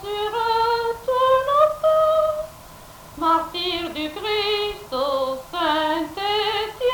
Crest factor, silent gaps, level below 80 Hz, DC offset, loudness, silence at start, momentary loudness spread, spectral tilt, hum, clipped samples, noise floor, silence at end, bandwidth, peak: 16 dB; none; -50 dBFS; under 0.1%; -21 LUFS; 0 s; 9 LU; -3.5 dB/octave; none; under 0.1%; -42 dBFS; 0 s; 19 kHz; -6 dBFS